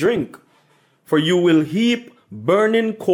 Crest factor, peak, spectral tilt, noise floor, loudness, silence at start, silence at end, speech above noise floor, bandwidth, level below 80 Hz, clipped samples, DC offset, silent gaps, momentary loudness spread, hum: 12 dB; -6 dBFS; -6 dB/octave; -58 dBFS; -18 LUFS; 0 s; 0 s; 41 dB; 16 kHz; -62 dBFS; under 0.1%; under 0.1%; none; 11 LU; none